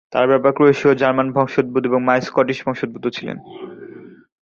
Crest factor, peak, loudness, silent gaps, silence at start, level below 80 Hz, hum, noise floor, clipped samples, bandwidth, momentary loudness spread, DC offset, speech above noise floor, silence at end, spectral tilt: 16 dB; -2 dBFS; -17 LUFS; none; 0.1 s; -60 dBFS; none; -39 dBFS; under 0.1%; 7.2 kHz; 21 LU; under 0.1%; 22 dB; 0.3 s; -7 dB/octave